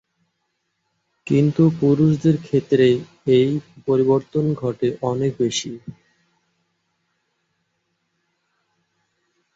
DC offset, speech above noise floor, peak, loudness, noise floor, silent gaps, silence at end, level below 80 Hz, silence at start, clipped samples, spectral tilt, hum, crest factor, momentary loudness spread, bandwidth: under 0.1%; 55 dB; -4 dBFS; -19 LUFS; -73 dBFS; none; 3.65 s; -58 dBFS; 1.25 s; under 0.1%; -7 dB/octave; none; 18 dB; 10 LU; 7.8 kHz